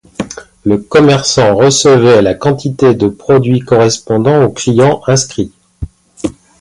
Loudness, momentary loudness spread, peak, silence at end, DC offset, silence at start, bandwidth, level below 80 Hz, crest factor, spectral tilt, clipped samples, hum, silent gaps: -10 LUFS; 16 LU; 0 dBFS; 0.3 s; under 0.1%; 0.2 s; 11.5 kHz; -38 dBFS; 10 dB; -5 dB/octave; under 0.1%; none; none